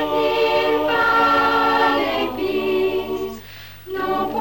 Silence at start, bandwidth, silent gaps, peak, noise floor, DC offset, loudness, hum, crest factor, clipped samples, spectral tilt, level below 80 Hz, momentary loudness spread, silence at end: 0 s; 20 kHz; none; -8 dBFS; -39 dBFS; 0.5%; -19 LUFS; none; 12 dB; under 0.1%; -5 dB/octave; -48 dBFS; 15 LU; 0 s